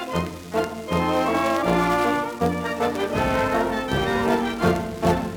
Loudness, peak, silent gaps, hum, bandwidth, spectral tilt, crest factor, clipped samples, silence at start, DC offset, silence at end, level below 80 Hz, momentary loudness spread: -23 LUFS; -6 dBFS; none; none; over 20 kHz; -6 dB/octave; 16 dB; under 0.1%; 0 s; under 0.1%; 0 s; -42 dBFS; 6 LU